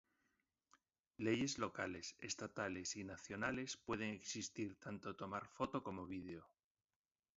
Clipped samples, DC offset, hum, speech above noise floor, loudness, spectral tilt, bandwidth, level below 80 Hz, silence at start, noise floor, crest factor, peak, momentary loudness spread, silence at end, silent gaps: under 0.1%; under 0.1%; none; over 44 dB; -46 LUFS; -4 dB/octave; 7.6 kHz; -72 dBFS; 1.2 s; under -90 dBFS; 22 dB; -26 dBFS; 9 LU; 0.9 s; none